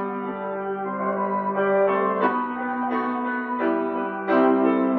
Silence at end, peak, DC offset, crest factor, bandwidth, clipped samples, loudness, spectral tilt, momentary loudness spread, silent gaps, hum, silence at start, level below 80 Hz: 0 s; -8 dBFS; under 0.1%; 16 dB; 4.7 kHz; under 0.1%; -23 LUFS; -9.5 dB/octave; 9 LU; none; none; 0 s; -68 dBFS